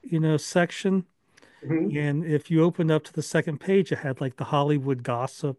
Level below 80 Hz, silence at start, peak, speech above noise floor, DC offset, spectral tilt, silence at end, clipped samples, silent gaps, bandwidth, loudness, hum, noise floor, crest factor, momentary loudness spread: -70 dBFS; 0.05 s; -8 dBFS; 33 dB; under 0.1%; -6.5 dB/octave; 0.05 s; under 0.1%; none; 12 kHz; -25 LUFS; none; -58 dBFS; 18 dB; 6 LU